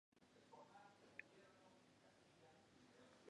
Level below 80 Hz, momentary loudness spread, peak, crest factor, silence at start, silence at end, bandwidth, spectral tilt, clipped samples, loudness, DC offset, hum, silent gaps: under -90 dBFS; 8 LU; -36 dBFS; 32 dB; 0.15 s; 0 s; 10.5 kHz; -4 dB/octave; under 0.1%; -65 LUFS; under 0.1%; none; none